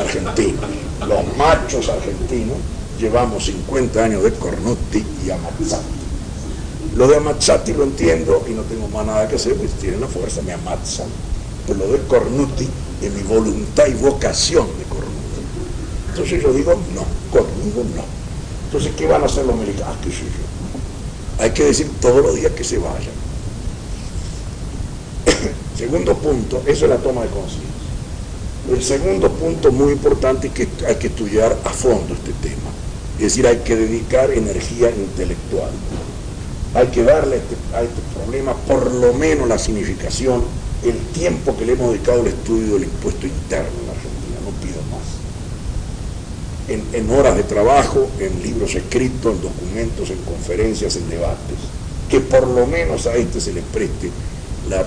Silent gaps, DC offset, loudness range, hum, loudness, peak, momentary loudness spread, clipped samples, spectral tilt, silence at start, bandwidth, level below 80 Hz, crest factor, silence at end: none; under 0.1%; 4 LU; none; -19 LUFS; -2 dBFS; 14 LU; under 0.1%; -5 dB/octave; 0 s; 10.5 kHz; -26 dBFS; 16 dB; 0 s